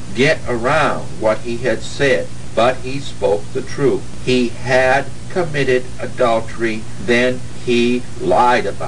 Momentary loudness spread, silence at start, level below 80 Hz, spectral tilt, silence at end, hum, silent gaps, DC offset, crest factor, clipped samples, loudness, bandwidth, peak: 8 LU; 0 s; -40 dBFS; -5 dB/octave; 0 s; none; none; 8%; 16 dB; under 0.1%; -17 LUFS; 10 kHz; 0 dBFS